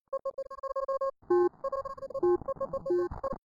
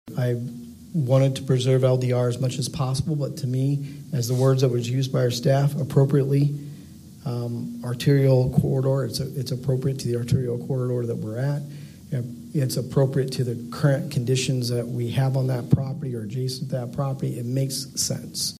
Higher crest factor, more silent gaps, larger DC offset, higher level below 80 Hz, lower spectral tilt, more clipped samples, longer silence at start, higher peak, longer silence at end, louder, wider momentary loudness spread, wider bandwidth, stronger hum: second, 14 dB vs 20 dB; neither; neither; about the same, -56 dBFS vs -52 dBFS; first, -8.5 dB/octave vs -6.5 dB/octave; neither; about the same, 0.1 s vs 0.05 s; second, -16 dBFS vs -4 dBFS; about the same, 0.05 s vs 0 s; second, -32 LUFS vs -24 LUFS; about the same, 10 LU vs 10 LU; second, 7.2 kHz vs 15 kHz; neither